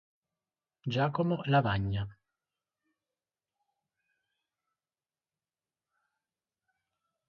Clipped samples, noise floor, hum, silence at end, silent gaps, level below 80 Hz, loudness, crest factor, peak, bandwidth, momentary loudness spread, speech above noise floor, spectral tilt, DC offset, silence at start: under 0.1%; under -90 dBFS; none; 5.15 s; none; -58 dBFS; -31 LUFS; 24 dB; -14 dBFS; 6.8 kHz; 12 LU; over 60 dB; -8.5 dB/octave; under 0.1%; 0.85 s